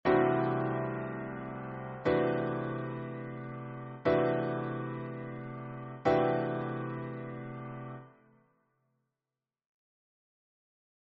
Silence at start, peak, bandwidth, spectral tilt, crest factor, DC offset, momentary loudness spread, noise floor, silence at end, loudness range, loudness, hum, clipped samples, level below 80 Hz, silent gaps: 0.05 s; -14 dBFS; 4.8 kHz; -6.5 dB/octave; 20 dB; under 0.1%; 14 LU; under -90 dBFS; 3 s; 14 LU; -34 LUFS; none; under 0.1%; -64 dBFS; none